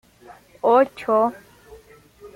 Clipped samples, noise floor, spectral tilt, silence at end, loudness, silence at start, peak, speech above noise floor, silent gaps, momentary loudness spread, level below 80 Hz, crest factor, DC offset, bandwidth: under 0.1%; -49 dBFS; -6 dB/octave; 0.1 s; -20 LUFS; 0.3 s; -6 dBFS; 29 dB; none; 7 LU; -60 dBFS; 18 dB; under 0.1%; 16 kHz